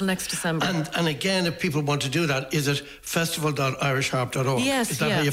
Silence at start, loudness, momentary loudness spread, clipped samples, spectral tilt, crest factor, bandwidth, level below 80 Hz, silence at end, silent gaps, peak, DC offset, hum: 0 s; -24 LUFS; 3 LU; under 0.1%; -4.5 dB/octave; 12 dB; 16 kHz; -54 dBFS; 0 s; none; -12 dBFS; under 0.1%; none